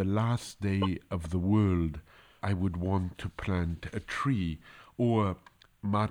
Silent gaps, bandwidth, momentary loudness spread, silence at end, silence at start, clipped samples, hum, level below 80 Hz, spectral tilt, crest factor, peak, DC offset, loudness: none; 11 kHz; 11 LU; 0 s; 0 s; under 0.1%; none; -48 dBFS; -7.5 dB/octave; 14 dB; -16 dBFS; under 0.1%; -31 LUFS